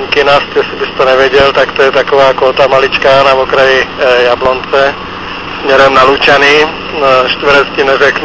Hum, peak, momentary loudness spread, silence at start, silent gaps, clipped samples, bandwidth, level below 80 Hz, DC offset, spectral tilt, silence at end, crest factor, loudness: none; 0 dBFS; 7 LU; 0 s; none; 3%; 8 kHz; -36 dBFS; 1%; -4 dB/octave; 0 s; 8 dB; -7 LUFS